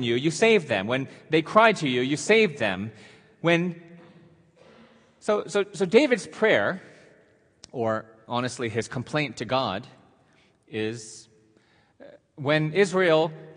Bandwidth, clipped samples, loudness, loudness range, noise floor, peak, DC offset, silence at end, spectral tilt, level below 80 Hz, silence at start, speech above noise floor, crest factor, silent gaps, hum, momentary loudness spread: 10.5 kHz; under 0.1%; -24 LUFS; 8 LU; -62 dBFS; -4 dBFS; under 0.1%; 0.05 s; -5 dB/octave; -70 dBFS; 0 s; 38 dB; 22 dB; none; none; 13 LU